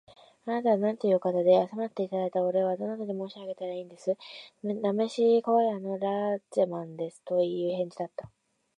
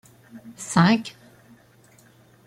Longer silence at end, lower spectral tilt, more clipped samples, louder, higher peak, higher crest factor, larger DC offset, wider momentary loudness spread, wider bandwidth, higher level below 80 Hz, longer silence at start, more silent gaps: second, 0.5 s vs 1.4 s; first, -7 dB/octave vs -5.5 dB/octave; neither; second, -29 LUFS vs -20 LUFS; second, -10 dBFS vs -6 dBFS; about the same, 18 dB vs 20 dB; neither; second, 14 LU vs 26 LU; second, 10.5 kHz vs 12 kHz; second, -78 dBFS vs -62 dBFS; about the same, 0.45 s vs 0.35 s; neither